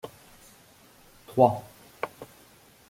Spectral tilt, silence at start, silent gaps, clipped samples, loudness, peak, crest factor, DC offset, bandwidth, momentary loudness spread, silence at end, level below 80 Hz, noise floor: -7 dB/octave; 0.05 s; none; under 0.1%; -27 LUFS; -6 dBFS; 26 dB; under 0.1%; 16.5 kHz; 26 LU; 0.65 s; -64 dBFS; -56 dBFS